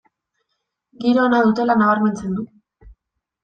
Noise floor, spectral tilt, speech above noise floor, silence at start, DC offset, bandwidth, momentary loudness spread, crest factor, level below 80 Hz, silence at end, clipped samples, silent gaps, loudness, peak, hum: -76 dBFS; -7 dB/octave; 59 dB; 1 s; under 0.1%; 9 kHz; 12 LU; 16 dB; -54 dBFS; 0.5 s; under 0.1%; none; -18 LUFS; -4 dBFS; none